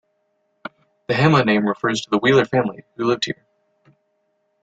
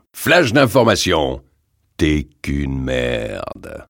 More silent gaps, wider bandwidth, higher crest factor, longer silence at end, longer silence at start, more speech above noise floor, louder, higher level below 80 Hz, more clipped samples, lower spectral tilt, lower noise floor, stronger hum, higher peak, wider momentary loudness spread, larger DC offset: neither; second, 8.8 kHz vs 17.5 kHz; about the same, 18 dB vs 18 dB; first, 1.3 s vs 0.05 s; first, 1.1 s vs 0.15 s; first, 50 dB vs 46 dB; about the same, -19 LUFS vs -17 LUFS; second, -58 dBFS vs -32 dBFS; neither; about the same, -6 dB/octave vs -5 dB/octave; first, -69 dBFS vs -63 dBFS; neither; second, -4 dBFS vs 0 dBFS; first, 22 LU vs 14 LU; neither